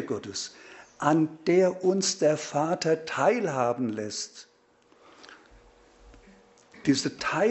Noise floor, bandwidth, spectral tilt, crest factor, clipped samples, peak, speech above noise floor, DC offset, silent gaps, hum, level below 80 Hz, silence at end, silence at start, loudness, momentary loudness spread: -62 dBFS; 8.2 kHz; -4.5 dB/octave; 20 dB; under 0.1%; -8 dBFS; 36 dB; under 0.1%; none; none; -64 dBFS; 0 s; 0 s; -26 LUFS; 11 LU